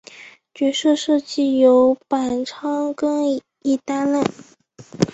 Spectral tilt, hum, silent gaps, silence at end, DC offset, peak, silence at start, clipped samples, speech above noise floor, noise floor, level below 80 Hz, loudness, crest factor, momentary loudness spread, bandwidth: -5.5 dB/octave; none; none; 0.05 s; under 0.1%; -2 dBFS; 0.15 s; under 0.1%; 25 dB; -43 dBFS; -60 dBFS; -19 LUFS; 18 dB; 10 LU; 8.2 kHz